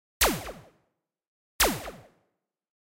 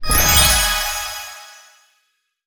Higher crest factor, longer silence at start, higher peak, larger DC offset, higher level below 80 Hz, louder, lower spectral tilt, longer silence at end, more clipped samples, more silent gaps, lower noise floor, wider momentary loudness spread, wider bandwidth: about the same, 22 dB vs 18 dB; first, 0.2 s vs 0 s; second, -10 dBFS vs 0 dBFS; neither; second, -44 dBFS vs -28 dBFS; second, -26 LUFS vs -14 LUFS; about the same, -2 dB/octave vs -1 dB/octave; about the same, 0.85 s vs 0.95 s; neither; first, 1.28-1.59 s vs none; first, -79 dBFS vs -68 dBFS; second, 18 LU vs 21 LU; second, 16 kHz vs over 20 kHz